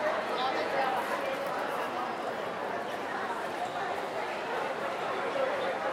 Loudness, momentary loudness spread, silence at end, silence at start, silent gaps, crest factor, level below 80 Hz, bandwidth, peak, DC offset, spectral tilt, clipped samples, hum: -33 LUFS; 5 LU; 0 s; 0 s; none; 16 dB; -72 dBFS; 16 kHz; -18 dBFS; under 0.1%; -3.5 dB/octave; under 0.1%; none